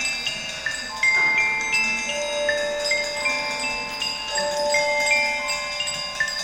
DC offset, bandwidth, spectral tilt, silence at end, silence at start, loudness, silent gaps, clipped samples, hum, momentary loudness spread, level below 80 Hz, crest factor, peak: under 0.1%; 16.5 kHz; 0 dB/octave; 0 s; 0 s; -22 LUFS; none; under 0.1%; none; 7 LU; -52 dBFS; 16 dB; -8 dBFS